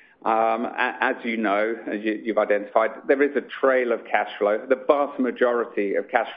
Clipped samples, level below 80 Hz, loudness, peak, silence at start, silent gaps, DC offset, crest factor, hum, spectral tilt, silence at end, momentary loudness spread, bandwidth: under 0.1%; -72 dBFS; -23 LUFS; -2 dBFS; 0.25 s; none; under 0.1%; 20 dB; none; -8.5 dB/octave; 0 s; 4 LU; 5 kHz